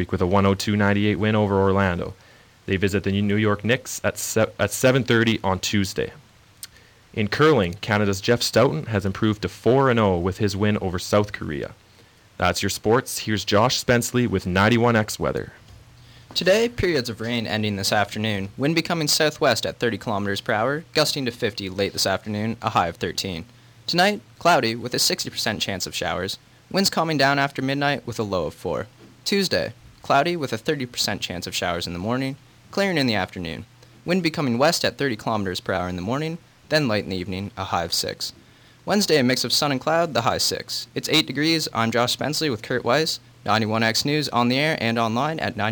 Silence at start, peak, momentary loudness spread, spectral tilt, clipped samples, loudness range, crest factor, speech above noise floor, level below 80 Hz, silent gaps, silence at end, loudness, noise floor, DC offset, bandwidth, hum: 0 s; -6 dBFS; 10 LU; -4.5 dB/octave; under 0.1%; 3 LU; 18 dB; 30 dB; -52 dBFS; none; 0 s; -22 LUFS; -53 dBFS; under 0.1%; 19 kHz; none